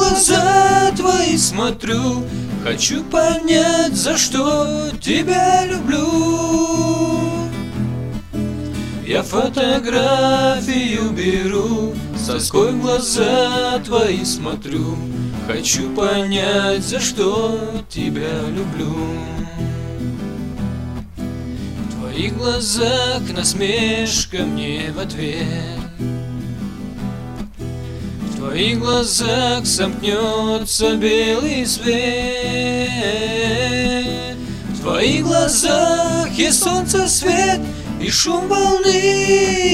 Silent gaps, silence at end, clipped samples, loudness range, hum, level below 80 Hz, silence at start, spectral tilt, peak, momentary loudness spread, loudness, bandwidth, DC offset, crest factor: none; 0 s; under 0.1%; 8 LU; none; -36 dBFS; 0 s; -3.5 dB/octave; 0 dBFS; 12 LU; -17 LUFS; 16 kHz; 0.7%; 16 dB